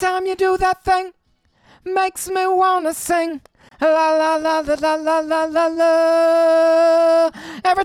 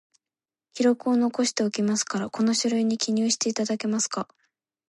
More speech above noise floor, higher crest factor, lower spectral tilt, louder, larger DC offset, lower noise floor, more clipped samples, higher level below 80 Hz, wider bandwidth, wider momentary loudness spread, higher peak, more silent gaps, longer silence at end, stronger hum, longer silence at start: second, 42 dB vs over 66 dB; second, 12 dB vs 18 dB; about the same, -3 dB/octave vs -3.5 dB/octave; first, -17 LUFS vs -25 LUFS; neither; second, -59 dBFS vs under -90 dBFS; neither; first, -48 dBFS vs -74 dBFS; first, 15 kHz vs 11.5 kHz; about the same, 7 LU vs 5 LU; about the same, -6 dBFS vs -8 dBFS; neither; second, 0 s vs 0.65 s; neither; second, 0 s vs 0.75 s